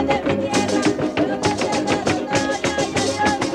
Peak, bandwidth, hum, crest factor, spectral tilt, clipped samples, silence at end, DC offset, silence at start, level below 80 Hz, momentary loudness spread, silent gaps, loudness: -6 dBFS; 13 kHz; none; 14 dB; -4 dB/octave; under 0.1%; 0 s; under 0.1%; 0 s; -46 dBFS; 2 LU; none; -20 LUFS